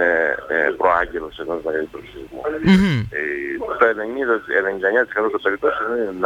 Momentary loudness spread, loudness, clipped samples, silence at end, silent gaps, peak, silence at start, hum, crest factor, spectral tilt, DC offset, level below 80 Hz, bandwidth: 11 LU; -20 LUFS; under 0.1%; 0 s; none; -2 dBFS; 0 s; none; 18 dB; -7 dB/octave; under 0.1%; -46 dBFS; 10.5 kHz